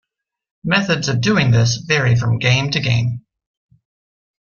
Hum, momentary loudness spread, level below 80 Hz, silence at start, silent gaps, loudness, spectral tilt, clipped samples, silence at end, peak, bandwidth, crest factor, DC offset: none; 6 LU; -48 dBFS; 0.65 s; none; -16 LUFS; -5 dB/octave; under 0.1%; 1.25 s; -2 dBFS; 7.2 kHz; 16 dB; under 0.1%